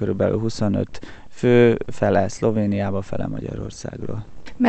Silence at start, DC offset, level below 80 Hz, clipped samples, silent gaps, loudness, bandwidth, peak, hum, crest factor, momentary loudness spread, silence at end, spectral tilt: 0 s; under 0.1%; -44 dBFS; under 0.1%; none; -21 LUFS; 8.8 kHz; -4 dBFS; none; 18 dB; 16 LU; 0 s; -7 dB/octave